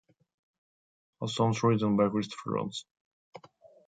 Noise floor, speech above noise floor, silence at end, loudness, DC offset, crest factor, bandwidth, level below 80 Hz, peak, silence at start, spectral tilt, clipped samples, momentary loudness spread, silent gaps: -58 dBFS; 29 dB; 0.5 s; -29 LUFS; under 0.1%; 20 dB; 9.2 kHz; -68 dBFS; -12 dBFS; 1.2 s; -6.5 dB/octave; under 0.1%; 12 LU; 2.91-3.32 s